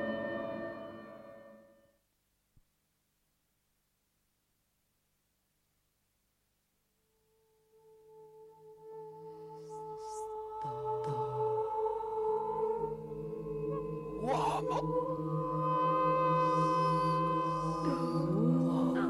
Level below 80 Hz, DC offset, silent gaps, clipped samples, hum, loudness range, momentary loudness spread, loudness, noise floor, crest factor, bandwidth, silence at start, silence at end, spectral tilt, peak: -62 dBFS; under 0.1%; none; under 0.1%; 50 Hz at -70 dBFS; 19 LU; 19 LU; -34 LUFS; -78 dBFS; 16 dB; 12 kHz; 0 s; 0 s; -7.5 dB/octave; -20 dBFS